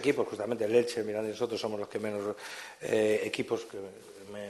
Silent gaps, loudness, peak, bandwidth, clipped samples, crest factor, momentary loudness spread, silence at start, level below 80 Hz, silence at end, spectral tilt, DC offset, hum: none; -32 LUFS; -12 dBFS; 12.5 kHz; under 0.1%; 20 dB; 15 LU; 0 s; -74 dBFS; 0 s; -4.5 dB/octave; under 0.1%; none